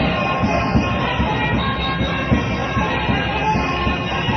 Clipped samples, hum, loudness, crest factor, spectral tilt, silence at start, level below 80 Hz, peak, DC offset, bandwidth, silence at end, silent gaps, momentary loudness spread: under 0.1%; none; -19 LUFS; 16 dB; -6.5 dB/octave; 0 s; -30 dBFS; -4 dBFS; under 0.1%; 6.4 kHz; 0 s; none; 2 LU